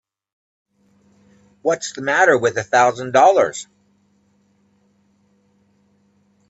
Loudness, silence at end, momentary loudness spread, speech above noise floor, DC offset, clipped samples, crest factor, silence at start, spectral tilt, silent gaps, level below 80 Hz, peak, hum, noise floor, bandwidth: -16 LUFS; 2.85 s; 11 LU; 44 dB; under 0.1%; under 0.1%; 20 dB; 1.65 s; -3.5 dB/octave; none; -66 dBFS; -2 dBFS; none; -60 dBFS; 8.2 kHz